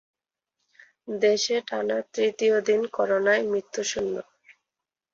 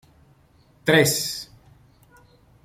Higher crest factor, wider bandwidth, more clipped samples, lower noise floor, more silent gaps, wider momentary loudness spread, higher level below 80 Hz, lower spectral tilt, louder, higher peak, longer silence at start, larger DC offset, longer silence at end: about the same, 18 dB vs 22 dB; second, 7.8 kHz vs 16.5 kHz; neither; first, -88 dBFS vs -57 dBFS; neither; second, 9 LU vs 17 LU; second, -68 dBFS vs -58 dBFS; about the same, -2.5 dB/octave vs -3.5 dB/octave; second, -25 LUFS vs -21 LUFS; second, -8 dBFS vs -4 dBFS; first, 1.05 s vs 0.85 s; neither; second, 0.9 s vs 1.2 s